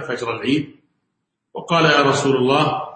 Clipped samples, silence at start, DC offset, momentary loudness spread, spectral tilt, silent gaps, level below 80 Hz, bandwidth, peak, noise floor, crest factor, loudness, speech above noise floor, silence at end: under 0.1%; 0 s; under 0.1%; 21 LU; -5 dB/octave; none; -60 dBFS; 8.8 kHz; -2 dBFS; -75 dBFS; 16 dB; -17 LUFS; 57 dB; 0 s